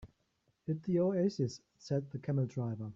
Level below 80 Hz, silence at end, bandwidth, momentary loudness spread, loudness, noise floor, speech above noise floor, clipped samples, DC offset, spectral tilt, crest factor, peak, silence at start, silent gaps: -68 dBFS; 0 s; 7.6 kHz; 8 LU; -35 LUFS; -78 dBFS; 43 dB; under 0.1%; under 0.1%; -8 dB/octave; 14 dB; -20 dBFS; 0 s; none